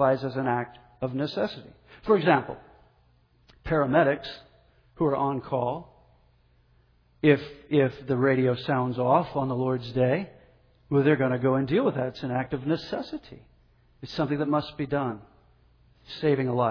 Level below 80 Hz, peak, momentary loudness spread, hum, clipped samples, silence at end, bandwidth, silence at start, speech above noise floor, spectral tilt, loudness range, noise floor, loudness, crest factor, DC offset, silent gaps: -56 dBFS; -8 dBFS; 16 LU; none; under 0.1%; 0 s; 5.4 kHz; 0 s; 37 dB; -9 dB/octave; 5 LU; -63 dBFS; -26 LUFS; 20 dB; under 0.1%; none